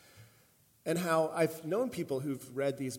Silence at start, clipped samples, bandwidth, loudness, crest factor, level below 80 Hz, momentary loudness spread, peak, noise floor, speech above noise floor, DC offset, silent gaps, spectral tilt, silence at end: 0.15 s; under 0.1%; 17 kHz; -34 LUFS; 18 dB; -76 dBFS; 7 LU; -16 dBFS; -66 dBFS; 33 dB; under 0.1%; none; -5.5 dB/octave; 0 s